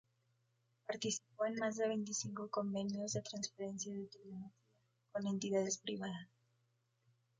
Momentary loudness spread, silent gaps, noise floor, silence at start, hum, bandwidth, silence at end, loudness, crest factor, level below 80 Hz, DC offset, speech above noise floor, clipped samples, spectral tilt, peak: 14 LU; none; -81 dBFS; 0.9 s; none; 9.6 kHz; 1.15 s; -41 LUFS; 18 dB; -82 dBFS; under 0.1%; 39 dB; under 0.1%; -4 dB/octave; -24 dBFS